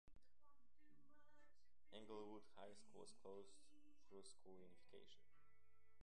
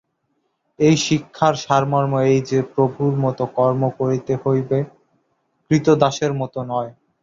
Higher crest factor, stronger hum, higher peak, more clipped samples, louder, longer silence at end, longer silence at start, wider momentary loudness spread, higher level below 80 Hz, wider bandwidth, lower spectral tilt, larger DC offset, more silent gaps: about the same, 20 dB vs 20 dB; neither; second, -44 dBFS vs 0 dBFS; neither; second, -64 LUFS vs -19 LUFS; second, 0 s vs 0.3 s; second, 0.05 s vs 0.8 s; about the same, 10 LU vs 8 LU; second, -86 dBFS vs -56 dBFS; first, 10.5 kHz vs 7.6 kHz; second, -4 dB/octave vs -6 dB/octave; first, 0.1% vs under 0.1%; neither